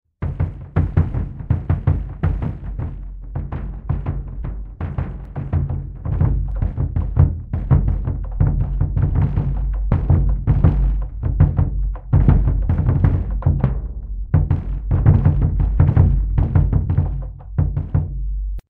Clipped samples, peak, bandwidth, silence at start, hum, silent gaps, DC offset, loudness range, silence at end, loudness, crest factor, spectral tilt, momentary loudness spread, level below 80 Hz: under 0.1%; 0 dBFS; 3.2 kHz; 0.2 s; none; none; under 0.1%; 7 LU; 0.1 s; -20 LUFS; 18 dB; -12 dB/octave; 12 LU; -22 dBFS